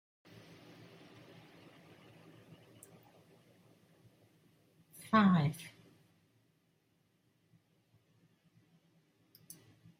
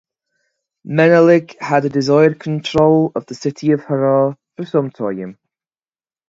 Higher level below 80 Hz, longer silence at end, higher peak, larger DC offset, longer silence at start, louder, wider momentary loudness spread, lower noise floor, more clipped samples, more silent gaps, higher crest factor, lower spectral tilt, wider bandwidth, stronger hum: second, -80 dBFS vs -52 dBFS; first, 4.3 s vs 0.95 s; second, -18 dBFS vs 0 dBFS; neither; first, 5.1 s vs 0.85 s; second, -31 LUFS vs -15 LUFS; first, 30 LU vs 12 LU; second, -76 dBFS vs under -90 dBFS; neither; neither; first, 24 dB vs 16 dB; about the same, -7 dB/octave vs -7 dB/octave; first, 16 kHz vs 7.8 kHz; neither